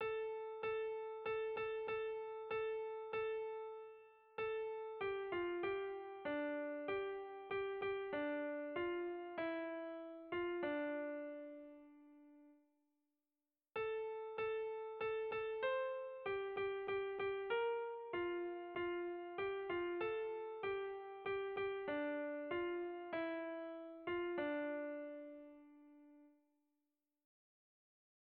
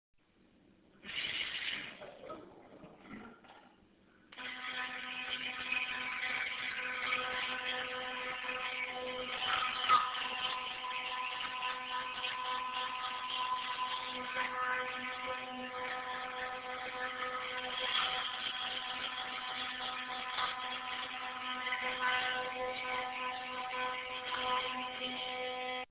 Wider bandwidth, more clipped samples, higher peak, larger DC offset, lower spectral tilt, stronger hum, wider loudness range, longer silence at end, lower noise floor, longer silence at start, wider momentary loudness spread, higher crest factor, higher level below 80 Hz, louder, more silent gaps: first, 4.8 kHz vs 4 kHz; neither; second, -30 dBFS vs -16 dBFS; neither; first, -2.5 dB/octave vs 2 dB/octave; neither; about the same, 5 LU vs 7 LU; first, 1.95 s vs 0.05 s; first, under -90 dBFS vs -68 dBFS; second, 0 s vs 0.95 s; about the same, 8 LU vs 8 LU; second, 14 dB vs 22 dB; second, -78 dBFS vs -72 dBFS; second, -44 LUFS vs -37 LUFS; neither